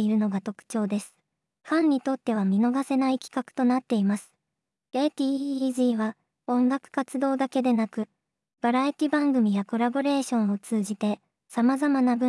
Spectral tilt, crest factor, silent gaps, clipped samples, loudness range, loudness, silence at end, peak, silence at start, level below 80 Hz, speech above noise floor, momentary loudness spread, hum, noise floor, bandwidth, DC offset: -6 dB/octave; 12 dB; none; under 0.1%; 2 LU; -26 LUFS; 0 s; -12 dBFS; 0 s; -88 dBFS; 60 dB; 9 LU; none; -85 dBFS; 12 kHz; under 0.1%